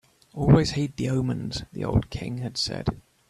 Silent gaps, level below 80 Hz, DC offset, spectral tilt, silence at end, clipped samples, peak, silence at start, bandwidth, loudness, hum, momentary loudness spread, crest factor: none; -42 dBFS; under 0.1%; -6.5 dB/octave; 0.3 s; under 0.1%; -4 dBFS; 0.35 s; 11.5 kHz; -26 LUFS; none; 13 LU; 22 dB